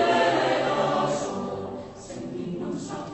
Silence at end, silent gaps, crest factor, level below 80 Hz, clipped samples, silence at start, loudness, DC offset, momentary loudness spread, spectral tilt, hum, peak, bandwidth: 0 s; none; 16 dB; -58 dBFS; under 0.1%; 0 s; -26 LUFS; under 0.1%; 15 LU; -4.5 dB/octave; none; -10 dBFS; 8.4 kHz